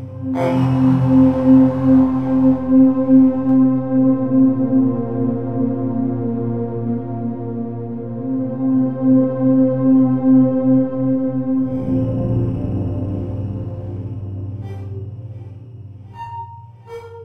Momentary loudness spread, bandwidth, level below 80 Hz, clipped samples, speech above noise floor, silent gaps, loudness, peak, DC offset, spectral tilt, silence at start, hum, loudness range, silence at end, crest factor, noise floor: 18 LU; 3.4 kHz; -44 dBFS; under 0.1%; 24 dB; none; -17 LUFS; -2 dBFS; under 0.1%; -11 dB/octave; 0 s; none; 13 LU; 0 s; 14 dB; -37 dBFS